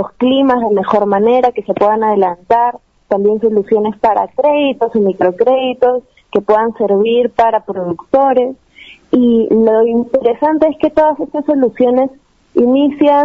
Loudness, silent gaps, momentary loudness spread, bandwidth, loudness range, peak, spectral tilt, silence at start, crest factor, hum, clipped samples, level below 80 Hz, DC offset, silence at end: -13 LUFS; none; 5 LU; 6.2 kHz; 1 LU; 0 dBFS; -8 dB/octave; 0 s; 12 dB; none; under 0.1%; -50 dBFS; under 0.1%; 0 s